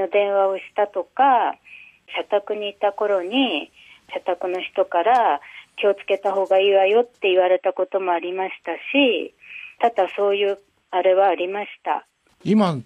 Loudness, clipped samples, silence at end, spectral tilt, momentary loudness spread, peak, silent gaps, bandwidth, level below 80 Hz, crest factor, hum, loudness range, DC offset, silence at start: -21 LUFS; under 0.1%; 0.05 s; -6.5 dB/octave; 12 LU; -8 dBFS; none; 9.2 kHz; -70 dBFS; 14 dB; none; 3 LU; under 0.1%; 0 s